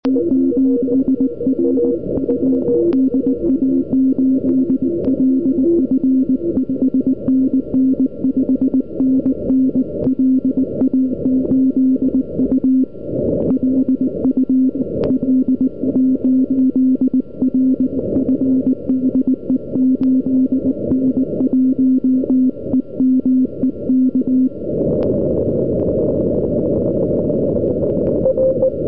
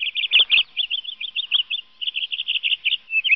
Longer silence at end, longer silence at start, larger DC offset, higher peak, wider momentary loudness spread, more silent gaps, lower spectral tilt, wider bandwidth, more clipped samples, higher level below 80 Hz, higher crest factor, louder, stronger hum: about the same, 0 s vs 0 s; about the same, 0 s vs 0 s; first, 2% vs 0.2%; about the same, -6 dBFS vs -6 dBFS; second, 3 LU vs 11 LU; neither; first, -14 dB/octave vs 8 dB/octave; second, 1.5 kHz vs 5.8 kHz; neither; first, -42 dBFS vs -68 dBFS; second, 10 dB vs 18 dB; first, -16 LUFS vs -19 LUFS; neither